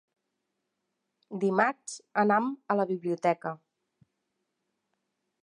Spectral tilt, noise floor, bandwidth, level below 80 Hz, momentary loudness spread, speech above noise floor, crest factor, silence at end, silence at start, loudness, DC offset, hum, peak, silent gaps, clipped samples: -6 dB/octave; -82 dBFS; 11 kHz; -88 dBFS; 14 LU; 54 dB; 22 dB; 1.85 s; 1.3 s; -28 LUFS; under 0.1%; none; -10 dBFS; none; under 0.1%